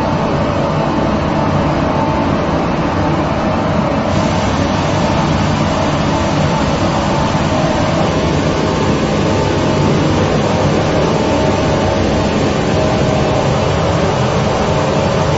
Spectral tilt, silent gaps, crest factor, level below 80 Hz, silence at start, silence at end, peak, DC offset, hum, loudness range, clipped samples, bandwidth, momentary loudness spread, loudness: -6 dB/octave; none; 12 dB; -28 dBFS; 0 s; 0 s; 0 dBFS; under 0.1%; none; 1 LU; under 0.1%; 8 kHz; 2 LU; -14 LUFS